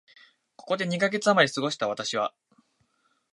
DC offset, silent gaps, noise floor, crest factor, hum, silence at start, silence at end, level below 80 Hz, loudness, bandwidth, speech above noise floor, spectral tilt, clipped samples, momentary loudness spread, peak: under 0.1%; none; -70 dBFS; 22 dB; none; 0.65 s; 1.05 s; -76 dBFS; -26 LUFS; 11.5 kHz; 45 dB; -4 dB/octave; under 0.1%; 9 LU; -6 dBFS